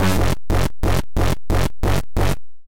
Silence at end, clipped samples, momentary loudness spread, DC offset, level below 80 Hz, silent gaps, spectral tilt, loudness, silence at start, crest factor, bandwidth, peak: 0 s; under 0.1%; 2 LU; under 0.1%; -24 dBFS; none; -5.5 dB/octave; -22 LUFS; 0 s; 8 dB; 17 kHz; -8 dBFS